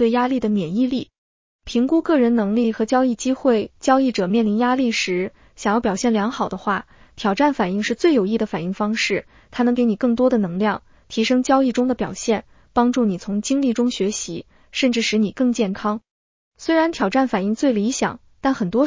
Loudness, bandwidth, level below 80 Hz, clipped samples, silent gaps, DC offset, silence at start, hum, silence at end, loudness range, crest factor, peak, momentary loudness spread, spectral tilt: -20 LUFS; 7.6 kHz; -52 dBFS; under 0.1%; 1.18-1.59 s, 16.11-16.52 s; under 0.1%; 0 s; none; 0 s; 2 LU; 16 dB; -4 dBFS; 8 LU; -5 dB/octave